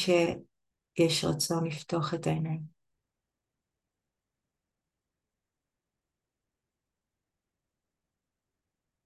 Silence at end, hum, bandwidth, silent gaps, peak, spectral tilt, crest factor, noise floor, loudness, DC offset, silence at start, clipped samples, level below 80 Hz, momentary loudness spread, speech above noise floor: 6.35 s; none; 12.5 kHz; none; -14 dBFS; -5 dB/octave; 22 dB; -88 dBFS; -30 LUFS; under 0.1%; 0 s; under 0.1%; -66 dBFS; 13 LU; 59 dB